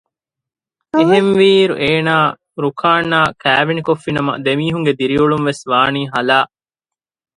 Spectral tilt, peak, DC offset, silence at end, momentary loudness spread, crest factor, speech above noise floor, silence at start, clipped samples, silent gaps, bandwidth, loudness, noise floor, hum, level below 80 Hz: -6 dB/octave; 0 dBFS; under 0.1%; 0.9 s; 7 LU; 16 dB; 73 dB; 0.95 s; under 0.1%; none; 11 kHz; -14 LUFS; -87 dBFS; none; -52 dBFS